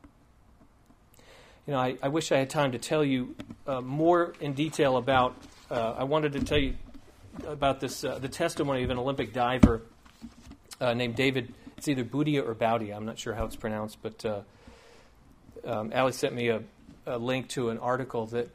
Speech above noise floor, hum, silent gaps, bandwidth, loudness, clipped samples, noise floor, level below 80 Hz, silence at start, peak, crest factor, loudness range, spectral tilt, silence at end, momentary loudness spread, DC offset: 31 dB; none; none; 15.5 kHz; -29 LUFS; under 0.1%; -59 dBFS; -46 dBFS; 1.3 s; -2 dBFS; 28 dB; 5 LU; -5.5 dB/octave; 0.05 s; 15 LU; under 0.1%